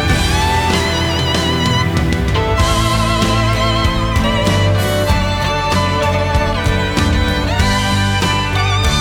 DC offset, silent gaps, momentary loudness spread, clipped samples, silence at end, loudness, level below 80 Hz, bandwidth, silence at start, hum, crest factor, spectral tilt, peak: under 0.1%; none; 2 LU; under 0.1%; 0 s; -15 LUFS; -22 dBFS; 19 kHz; 0 s; none; 12 dB; -5 dB/octave; -2 dBFS